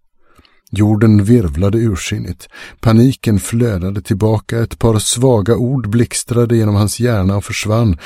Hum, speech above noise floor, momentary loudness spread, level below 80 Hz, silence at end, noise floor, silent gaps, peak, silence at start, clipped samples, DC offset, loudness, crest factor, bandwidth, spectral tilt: none; 36 dB; 9 LU; -34 dBFS; 0 s; -49 dBFS; none; 0 dBFS; 0.7 s; under 0.1%; under 0.1%; -14 LUFS; 14 dB; 15.5 kHz; -6 dB/octave